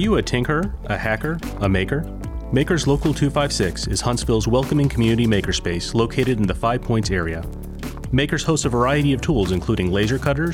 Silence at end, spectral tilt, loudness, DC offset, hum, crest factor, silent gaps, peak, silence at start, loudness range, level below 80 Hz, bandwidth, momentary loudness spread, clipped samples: 0 s; -5.5 dB/octave; -20 LUFS; under 0.1%; none; 12 dB; none; -8 dBFS; 0 s; 2 LU; -32 dBFS; 16.5 kHz; 7 LU; under 0.1%